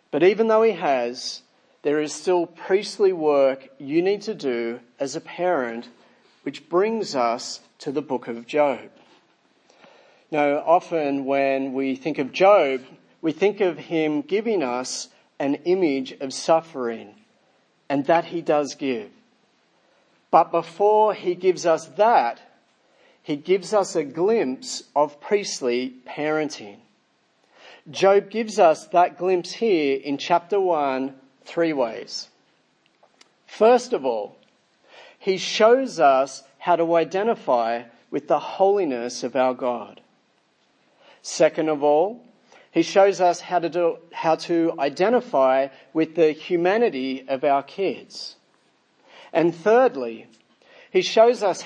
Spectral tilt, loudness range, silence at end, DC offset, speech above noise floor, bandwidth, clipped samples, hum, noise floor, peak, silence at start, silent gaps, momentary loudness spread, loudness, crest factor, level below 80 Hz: -4.5 dB/octave; 5 LU; 0 s; under 0.1%; 44 dB; 10 kHz; under 0.1%; none; -65 dBFS; -2 dBFS; 0.15 s; none; 13 LU; -22 LUFS; 22 dB; -82 dBFS